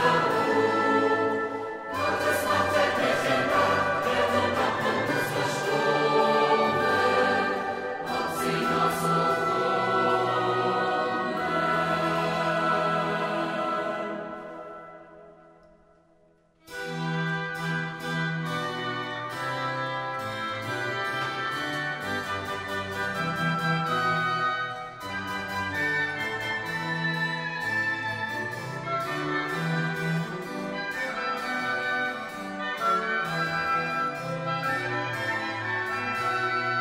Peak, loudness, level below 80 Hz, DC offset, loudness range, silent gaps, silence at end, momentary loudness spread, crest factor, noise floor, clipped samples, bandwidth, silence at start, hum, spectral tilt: -10 dBFS; -27 LUFS; -62 dBFS; under 0.1%; 7 LU; none; 0 s; 9 LU; 18 dB; -62 dBFS; under 0.1%; 16 kHz; 0 s; none; -5 dB/octave